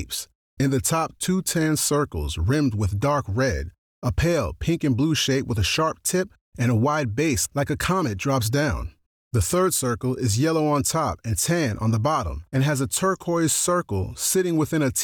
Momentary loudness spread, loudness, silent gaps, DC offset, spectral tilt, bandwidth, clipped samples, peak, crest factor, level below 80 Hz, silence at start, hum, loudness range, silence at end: 6 LU; -23 LUFS; 0.35-0.57 s, 3.78-4.02 s, 6.41-6.52 s, 9.06-9.31 s; under 0.1%; -4.5 dB/octave; 20 kHz; under 0.1%; -12 dBFS; 12 dB; -40 dBFS; 0 s; none; 1 LU; 0 s